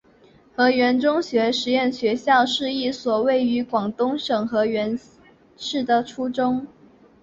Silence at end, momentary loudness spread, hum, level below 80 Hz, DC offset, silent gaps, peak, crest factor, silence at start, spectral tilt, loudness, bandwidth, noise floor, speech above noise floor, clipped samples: 0.55 s; 10 LU; none; -62 dBFS; under 0.1%; none; -6 dBFS; 16 dB; 0.6 s; -4.5 dB/octave; -21 LUFS; 7.6 kHz; -53 dBFS; 32 dB; under 0.1%